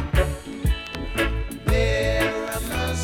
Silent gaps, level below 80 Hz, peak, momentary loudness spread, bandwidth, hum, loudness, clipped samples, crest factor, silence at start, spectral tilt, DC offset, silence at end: none; -28 dBFS; -8 dBFS; 6 LU; 17.5 kHz; none; -24 LUFS; under 0.1%; 16 dB; 0 s; -5 dB/octave; under 0.1%; 0 s